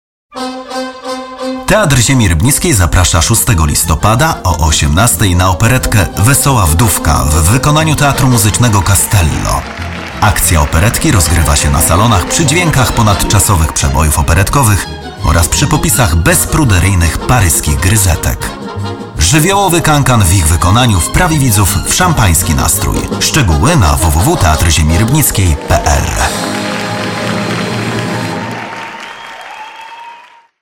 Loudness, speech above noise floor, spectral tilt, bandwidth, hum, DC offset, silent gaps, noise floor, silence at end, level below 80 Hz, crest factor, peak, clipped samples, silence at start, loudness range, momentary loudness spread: -10 LUFS; 28 dB; -4 dB/octave; 17.5 kHz; none; 0.9%; none; -37 dBFS; 0.35 s; -18 dBFS; 10 dB; 0 dBFS; under 0.1%; 0.3 s; 3 LU; 12 LU